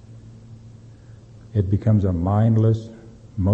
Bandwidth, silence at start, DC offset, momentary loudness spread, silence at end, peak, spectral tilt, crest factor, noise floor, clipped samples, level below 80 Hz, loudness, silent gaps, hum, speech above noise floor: 4 kHz; 0.1 s; under 0.1%; 11 LU; 0 s; -6 dBFS; -10.5 dB/octave; 16 dB; -44 dBFS; under 0.1%; -44 dBFS; -20 LUFS; none; none; 26 dB